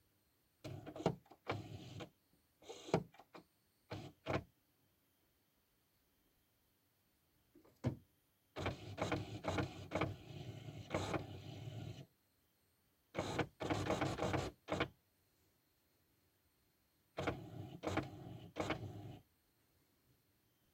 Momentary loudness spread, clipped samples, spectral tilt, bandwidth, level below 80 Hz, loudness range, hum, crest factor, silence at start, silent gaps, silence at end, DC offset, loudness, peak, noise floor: 15 LU; under 0.1%; -5.5 dB/octave; 16 kHz; -66 dBFS; 9 LU; none; 26 dB; 0.65 s; none; 1.5 s; under 0.1%; -45 LUFS; -22 dBFS; -79 dBFS